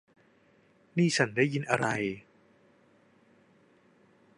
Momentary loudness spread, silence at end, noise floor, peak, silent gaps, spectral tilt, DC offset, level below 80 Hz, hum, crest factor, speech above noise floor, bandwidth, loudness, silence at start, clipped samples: 10 LU; 2.2 s; -64 dBFS; -8 dBFS; none; -5 dB/octave; under 0.1%; -72 dBFS; none; 26 dB; 36 dB; 11 kHz; -29 LUFS; 0.95 s; under 0.1%